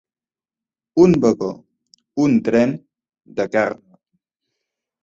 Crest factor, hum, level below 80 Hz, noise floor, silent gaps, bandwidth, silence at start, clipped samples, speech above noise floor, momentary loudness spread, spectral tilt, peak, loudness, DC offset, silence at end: 18 dB; none; -56 dBFS; under -90 dBFS; none; 7.8 kHz; 0.95 s; under 0.1%; over 74 dB; 18 LU; -7.5 dB/octave; -2 dBFS; -18 LUFS; under 0.1%; 1.3 s